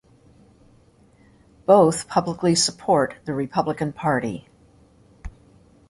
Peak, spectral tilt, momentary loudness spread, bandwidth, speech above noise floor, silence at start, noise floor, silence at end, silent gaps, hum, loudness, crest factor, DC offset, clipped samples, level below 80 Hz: -2 dBFS; -4.5 dB/octave; 25 LU; 12 kHz; 35 dB; 1.7 s; -55 dBFS; 0.6 s; none; none; -21 LUFS; 20 dB; under 0.1%; under 0.1%; -52 dBFS